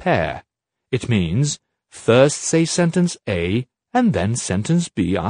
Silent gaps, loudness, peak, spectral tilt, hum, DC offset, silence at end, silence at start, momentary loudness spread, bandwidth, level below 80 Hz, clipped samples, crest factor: none; -19 LUFS; 0 dBFS; -5.5 dB/octave; none; under 0.1%; 0 s; 0 s; 10 LU; 10 kHz; -46 dBFS; under 0.1%; 18 dB